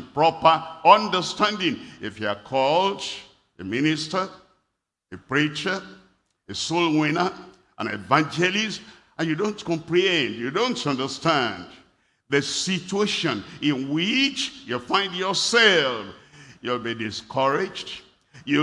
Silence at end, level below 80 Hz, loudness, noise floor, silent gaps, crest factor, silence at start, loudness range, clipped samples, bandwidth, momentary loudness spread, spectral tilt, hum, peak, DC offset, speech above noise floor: 0 s; -64 dBFS; -23 LUFS; -78 dBFS; none; 24 dB; 0 s; 5 LU; under 0.1%; 12 kHz; 15 LU; -4 dB/octave; none; 0 dBFS; under 0.1%; 55 dB